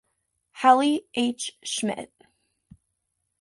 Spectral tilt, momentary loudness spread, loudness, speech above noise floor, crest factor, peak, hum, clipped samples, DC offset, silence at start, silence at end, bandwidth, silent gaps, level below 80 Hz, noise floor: -3 dB/octave; 15 LU; -24 LUFS; 55 dB; 20 dB; -6 dBFS; none; under 0.1%; under 0.1%; 0.55 s; 1.35 s; 11.5 kHz; none; -70 dBFS; -78 dBFS